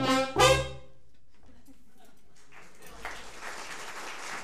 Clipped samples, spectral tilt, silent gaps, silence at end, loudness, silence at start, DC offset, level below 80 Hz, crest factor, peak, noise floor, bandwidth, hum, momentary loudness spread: under 0.1%; -3.5 dB/octave; none; 0 s; -29 LUFS; 0 s; 0.7%; -50 dBFS; 24 dB; -8 dBFS; -64 dBFS; 15.5 kHz; none; 25 LU